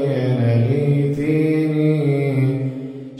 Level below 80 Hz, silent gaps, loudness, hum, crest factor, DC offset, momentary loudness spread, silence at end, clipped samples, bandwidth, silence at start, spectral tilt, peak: -54 dBFS; none; -18 LUFS; none; 12 dB; under 0.1%; 4 LU; 0 s; under 0.1%; 10.5 kHz; 0 s; -9.5 dB/octave; -6 dBFS